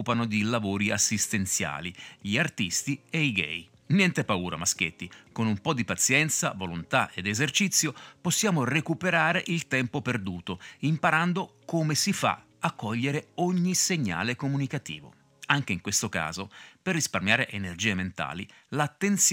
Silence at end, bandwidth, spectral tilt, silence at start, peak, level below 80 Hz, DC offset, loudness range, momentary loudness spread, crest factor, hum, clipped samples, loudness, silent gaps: 0 s; 17 kHz; -3.5 dB/octave; 0 s; -6 dBFS; -62 dBFS; under 0.1%; 3 LU; 11 LU; 22 dB; none; under 0.1%; -27 LUFS; none